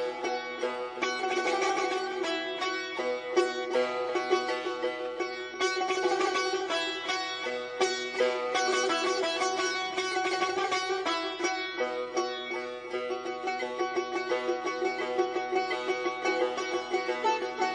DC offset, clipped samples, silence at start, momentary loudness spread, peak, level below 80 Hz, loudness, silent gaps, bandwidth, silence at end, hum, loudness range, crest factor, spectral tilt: under 0.1%; under 0.1%; 0 s; 6 LU; -12 dBFS; -70 dBFS; -30 LUFS; none; 10 kHz; 0 s; none; 3 LU; 18 dB; -1.5 dB/octave